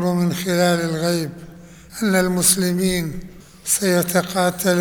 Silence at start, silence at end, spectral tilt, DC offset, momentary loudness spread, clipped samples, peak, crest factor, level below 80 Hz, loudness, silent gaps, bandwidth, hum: 0 s; 0 s; -4 dB/octave; 0.2%; 15 LU; under 0.1%; -2 dBFS; 18 dB; -46 dBFS; -19 LUFS; none; over 20 kHz; none